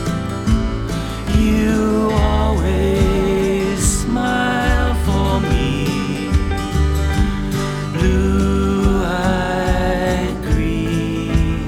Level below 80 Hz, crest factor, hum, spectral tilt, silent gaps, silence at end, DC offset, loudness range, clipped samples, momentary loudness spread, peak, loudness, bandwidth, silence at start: -22 dBFS; 14 dB; none; -6 dB/octave; none; 0 s; under 0.1%; 2 LU; under 0.1%; 4 LU; -2 dBFS; -18 LUFS; 16 kHz; 0 s